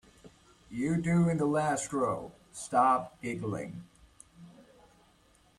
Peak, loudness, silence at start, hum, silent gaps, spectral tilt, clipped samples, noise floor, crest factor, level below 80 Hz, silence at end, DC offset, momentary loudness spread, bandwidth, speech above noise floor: -14 dBFS; -30 LUFS; 0.25 s; none; none; -6.5 dB/octave; under 0.1%; -64 dBFS; 20 dB; -62 dBFS; 0.95 s; under 0.1%; 17 LU; 12 kHz; 35 dB